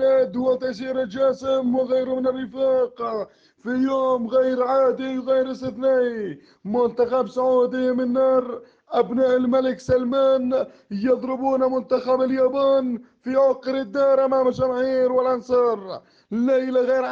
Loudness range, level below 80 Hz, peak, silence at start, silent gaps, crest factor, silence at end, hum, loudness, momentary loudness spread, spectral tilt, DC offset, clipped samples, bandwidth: 2 LU; -58 dBFS; -8 dBFS; 0 s; none; 12 dB; 0 s; none; -21 LUFS; 9 LU; -7 dB/octave; under 0.1%; under 0.1%; 7 kHz